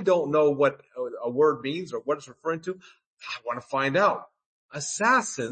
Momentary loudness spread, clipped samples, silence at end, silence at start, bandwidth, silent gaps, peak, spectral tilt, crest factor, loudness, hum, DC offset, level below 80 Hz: 14 LU; under 0.1%; 0 s; 0 s; 8.8 kHz; 3.06-3.17 s, 4.46-4.69 s; -8 dBFS; -4 dB/octave; 18 dB; -26 LUFS; none; under 0.1%; -74 dBFS